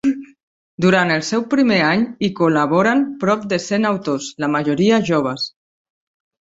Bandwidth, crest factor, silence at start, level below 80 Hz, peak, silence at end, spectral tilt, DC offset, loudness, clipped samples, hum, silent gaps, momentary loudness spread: 8 kHz; 16 dB; 0.05 s; -58 dBFS; -2 dBFS; 1 s; -5.5 dB/octave; under 0.1%; -17 LUFS; under 0.1%; none; 0.43-0.78 s; 7 LU